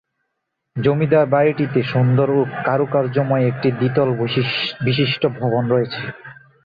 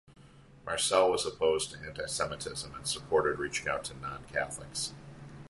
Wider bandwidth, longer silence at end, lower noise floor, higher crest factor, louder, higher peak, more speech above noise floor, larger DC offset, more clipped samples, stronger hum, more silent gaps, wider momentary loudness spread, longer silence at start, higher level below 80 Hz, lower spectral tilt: second, 5 kHz vs 11.5 kHz; first, 0.3 s vs 0 s; first, -76 dBFS vs -56 dBFS; second, 14 dB vs 22 dB; first, -18 LUFS vs -32 LUFS; first, -4 dBFS vs -10 dBFS; first, 58 dB vs 23 dB; neither; neither; neither; neither; second, 5 LU vs 13 LU; first, 0.75 s vs 0.1 s; about the same, -56 dBFS vs -58 dBFS; first, -9.5 dB/octave vs -2.5 dB/octave